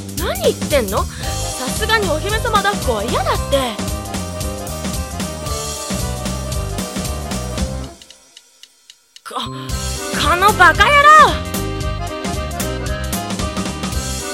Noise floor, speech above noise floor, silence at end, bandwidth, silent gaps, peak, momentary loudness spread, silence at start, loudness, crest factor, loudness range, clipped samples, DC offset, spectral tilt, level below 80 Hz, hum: -48 dBFS; 34 dB; 0 s; 17 kHz; none; 0 dBFS; 14 LU; 0 s; -17 LUFS; 18 dB; 13 LU; 0.1%; under 0.1%; -3.5 dB/octave; -28 dBFS; none